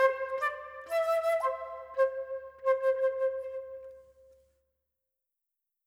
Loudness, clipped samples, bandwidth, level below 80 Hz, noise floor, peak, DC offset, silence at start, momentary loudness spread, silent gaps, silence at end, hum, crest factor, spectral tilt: -31 LUFS; under 0.1%; 16 kHz; -72 dBFS; -87 dBFS; -14 dBFS; under 0.1%; 0 s; 14 LU; none; 1.85 s; none; 20 dB; -1.5 dB/octave